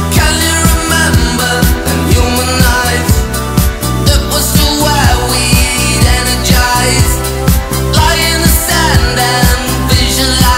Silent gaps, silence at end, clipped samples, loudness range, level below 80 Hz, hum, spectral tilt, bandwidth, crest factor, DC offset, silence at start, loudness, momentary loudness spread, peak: none; 0 s; 0.3%; 1 LU; -16 dBFS; none; -3.5 dB/octave; 16.5 kHz; 10 dB; 0.5%; 0 s; -10 LUFS; 4 LU; 0 dBFS